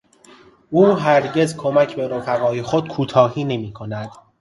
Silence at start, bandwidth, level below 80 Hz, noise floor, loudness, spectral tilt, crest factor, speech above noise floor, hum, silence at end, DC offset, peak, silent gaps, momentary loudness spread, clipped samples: 0.7 s; 11.5 kHz; -56 dBFS; -48 dBFS; -18 LUFS; -6.5 dB/octave; 18 dB; 30 dB; none; 0.25 s; under 0.1%; 0 dBFS; none; 14 LU; under 0.1%